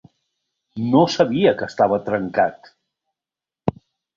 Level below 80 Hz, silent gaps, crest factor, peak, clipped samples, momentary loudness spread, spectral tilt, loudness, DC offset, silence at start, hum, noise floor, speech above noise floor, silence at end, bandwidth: -56 dBFS; none; 20 dB; -2 dBFS; under 0.1%; 11 LU; -6.5 dB/octave; -20 LUFS; under 0.1%; 0.75 s; none; -89 dBFS; 71 dB; 0.45 s; 7.6 kHz